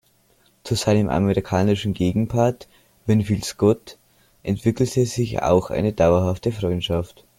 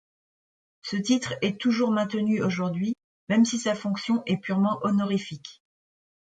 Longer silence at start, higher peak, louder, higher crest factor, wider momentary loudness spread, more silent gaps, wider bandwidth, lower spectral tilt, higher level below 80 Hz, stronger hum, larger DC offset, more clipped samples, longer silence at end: second, 0.65 s vs 0.85 s; first, -4 dBFS vs -12 dBFS; first, -21 LUFS vs -26 LUFS; about the same, 18 dB vs 16 dB; about the same, 8 LU vs 10 LU; second, none vs 3.04-3.27 s; first, 16.5 kHz vs 9.2 kHz; about the same, -6.5 dB/octave vs -5.5 dB/octave; first, -46 dBFS vs -68 dBFS; neither; neither; neither; second, 0.35 s vs 0.85 s